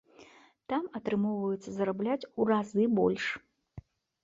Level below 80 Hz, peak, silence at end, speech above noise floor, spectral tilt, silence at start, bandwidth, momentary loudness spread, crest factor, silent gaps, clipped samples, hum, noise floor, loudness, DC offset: -66 dBFS; -14 dBFS; 0.45 s; 28 dB; -7 dB/octave; 0.2 s; 7.6 kHz; 8 LU; 18 dB; none; under 0.1%; none; -58 dBFS; -31 LUFS; under 0.1%